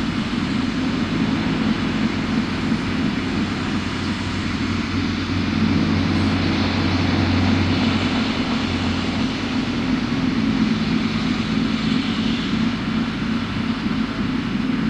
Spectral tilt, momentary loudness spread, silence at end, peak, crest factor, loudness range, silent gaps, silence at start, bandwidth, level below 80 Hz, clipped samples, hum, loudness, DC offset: -6 dB/octave; 4 LU; 0 s; -6 dBFS; 14 dB; 3 LU; none; 0 s; 9.8 kHz; -38 dBFS; under 0.1%; none; -21 LUFS; under 0.1%